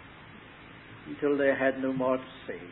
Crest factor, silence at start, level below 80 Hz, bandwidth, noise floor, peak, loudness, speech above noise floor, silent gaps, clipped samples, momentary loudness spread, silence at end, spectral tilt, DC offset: 18 dB; 0 s; -64 dBFS; 4.1 kHz; -49 dBFS; -12 dBFS; -28 LUFS; 21 dB; none; under 0.1%; 23 LU; 0 s; -10 dB/octave; under 0.1%